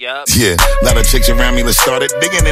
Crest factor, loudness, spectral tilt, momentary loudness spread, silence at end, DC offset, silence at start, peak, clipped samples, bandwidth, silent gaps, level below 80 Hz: 10 dB; -11 LUFS; -3 dB/octave; 3 LU; 0 s; under 0.1%; 0 s; 0 dBFS; under 0.1%; 16.5 kHz; none; -14 dBFS